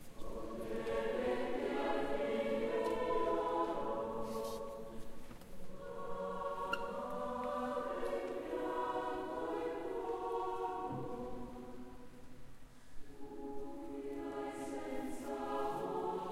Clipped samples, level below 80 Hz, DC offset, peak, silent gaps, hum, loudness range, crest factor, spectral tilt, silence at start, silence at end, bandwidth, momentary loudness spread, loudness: under 0.1%; -56 dBFS; under 0.1%; -22 dBFS; none; none; 10 LU; 18 dB; -5.5 dB/octave; 0 s; 0 s; 16 kHz; 16 LU; -40 LUFS